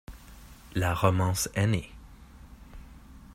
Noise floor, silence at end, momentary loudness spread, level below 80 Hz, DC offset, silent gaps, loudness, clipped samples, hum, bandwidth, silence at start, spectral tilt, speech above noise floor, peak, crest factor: -49 dBFS; 0 s; 25 LU; -48 dBFS; under 0.1%; none; -28 LUFS; under 0.1%; none; 16 kHz; 0.1 s; -5 dB/octave; 23 dB; -8 dBFS; 22 dB